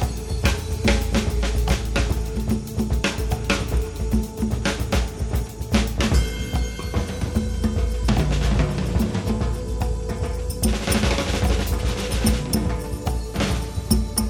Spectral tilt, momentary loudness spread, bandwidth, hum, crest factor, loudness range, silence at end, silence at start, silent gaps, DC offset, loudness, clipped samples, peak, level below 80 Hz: -5 dB/octave; 5 LU; 18.5 kHz; none; 18 dB; 1 LU; 0 s; 0 s; none; under 0.1%; -24 LUFS; under 0.1%; -2 dBFS; -26 dBFS